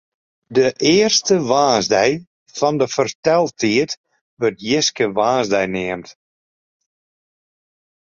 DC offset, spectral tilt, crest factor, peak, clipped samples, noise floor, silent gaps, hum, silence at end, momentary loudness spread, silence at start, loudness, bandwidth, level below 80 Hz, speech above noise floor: under 0.1%; -3.5 dB/octave; 16 dB; -2 dBFS; under 0.1%; under -90 dBFS; 2.27-2.46 s, 3.15-3.23 s, 3.97-4.04 s, 4.21-4.37 s; none; 2 s; 10 LU; 0.5 s; -17 LUFS; 7.6 kHz; -56 dBFS; over 73 dB